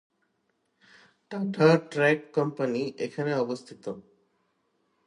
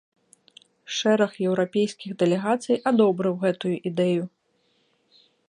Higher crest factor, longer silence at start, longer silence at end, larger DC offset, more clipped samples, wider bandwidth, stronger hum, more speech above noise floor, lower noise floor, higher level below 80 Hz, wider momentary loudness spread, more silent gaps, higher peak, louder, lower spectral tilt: about the same, 20 dB vs 18 dB; first, 1.3 s vs 0.9 s; second, 1.05 s vs 1.25 s; neither; neither; about the same, 11 kHz vs 11 kHz; neither; about the same, 48 dB vs 45 dB; first, -75 dBFS vs -68 dBFS; about the same, -76 dBFS vs -74 dBFS; first, 18 LU vs 7 LU; neither; about the same, -8 dBFS vs -6 dBFS; about the same, -26 LUFS vs -24 LUFS; about the same, -6.5 dB/octave vs -6 dB/octave